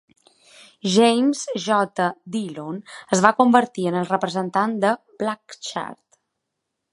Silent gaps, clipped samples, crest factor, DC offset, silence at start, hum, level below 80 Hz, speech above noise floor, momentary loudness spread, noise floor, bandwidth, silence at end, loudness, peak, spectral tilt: none; under 0.1%; 22 dB; under 0.1%; 0.85 s; none; -70 dBFS; 59 dB; 15 LU; -80 dBFS; 11.5 kHz; 1 s; -21 LUFS; 0 dBFS; -4.5 dB/octave